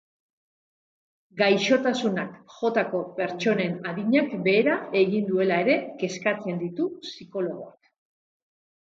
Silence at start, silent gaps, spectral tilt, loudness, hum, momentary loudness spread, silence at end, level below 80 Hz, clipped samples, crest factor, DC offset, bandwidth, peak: 1.35 s; none; -5.5 dB/octave; -25 LUFS; none; 10 LU; 1.1 s; -74 dBFS; under 0.1%; 18 dB; under 0.1%; 7.8 kHz; -8 dBFS